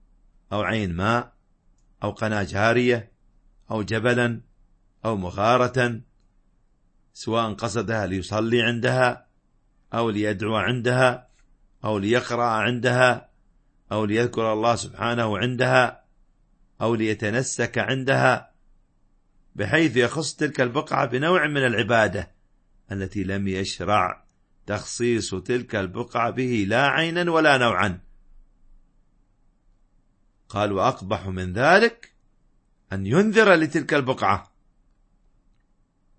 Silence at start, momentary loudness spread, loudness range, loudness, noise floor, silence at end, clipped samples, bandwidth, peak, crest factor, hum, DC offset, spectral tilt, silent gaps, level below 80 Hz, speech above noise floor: 0.5 s; 12 LU; 4 LU; -23 LUFS; -64 dBFS; 1.75 s; under 0.1%; 8.8 kHz; -2 dBFS; 22 dB; none; under 0.1%; -5 dB/octave; none; -54 dBFS; 42 dB